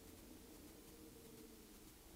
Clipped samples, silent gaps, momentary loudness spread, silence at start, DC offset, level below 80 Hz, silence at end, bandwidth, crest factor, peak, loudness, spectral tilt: under 0.1%; none; 1 LU; 0 s; under 0.1%; -68 dBFS; 0 s; 16 kHz; 14 dB; -46 dBFS; -60 LUFS; -4 dB/octave